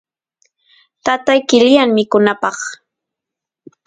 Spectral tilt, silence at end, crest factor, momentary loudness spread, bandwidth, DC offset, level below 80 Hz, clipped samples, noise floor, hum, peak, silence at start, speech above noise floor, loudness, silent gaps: -4 dB/octave; 1.15 s; 16 dB; 13 LU; 9.4 kHz; under 0.1%; -58 dBFS; under 0.1%; -84 dBFS; none; 0 dBFS; 1.05 s; 71 dB; -13 LUFS; none